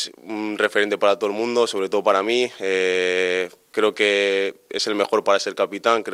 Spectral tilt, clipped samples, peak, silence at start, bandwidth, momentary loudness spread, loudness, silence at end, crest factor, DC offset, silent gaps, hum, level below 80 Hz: -2.5 dB/octave; under 0.1%; -4 dBFS; 0 s; 14.5 kHz; 7 LU; -21 LUFS; 0 s; 18 dB; under 0.1%; none; none; -70 dBFS